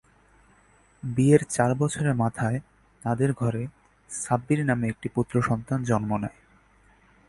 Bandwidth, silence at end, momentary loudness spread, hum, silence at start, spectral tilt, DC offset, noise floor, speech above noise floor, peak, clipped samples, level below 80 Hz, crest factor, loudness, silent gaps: 11.5 kHz; 1 s; 13 LU; none; 1.05 s; -7 dB/octave; under 0.1%; -59 dBFS; 35 dB; -4 dBFS; under 0.1%; -54 dBFS; 22 dB; -26 LUFS; none